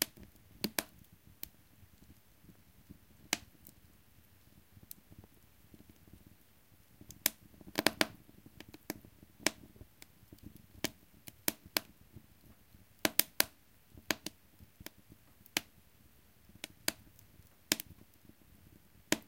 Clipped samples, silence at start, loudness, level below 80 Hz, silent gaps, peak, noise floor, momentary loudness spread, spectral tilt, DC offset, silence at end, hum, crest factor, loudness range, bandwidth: under 0.1%; 0 s; -37 LUFS; -68 dBFS; none; -4 dBFS; -66 dBFS; 26 LU; -1.5 dB/octave; under 0.1%; 0.05 s; none; 40 dB; 10 LU; 17 kHz